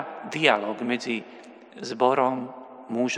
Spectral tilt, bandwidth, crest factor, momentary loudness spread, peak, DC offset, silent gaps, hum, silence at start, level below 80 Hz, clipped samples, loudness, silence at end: -4 dB/octave; 10.5 kHz; 24 dB; 19 LU; -4 dBFS; under 0.1%; none; none; 0 s; -82 dBFS; under 0.1%; -25 LUFS; 0 s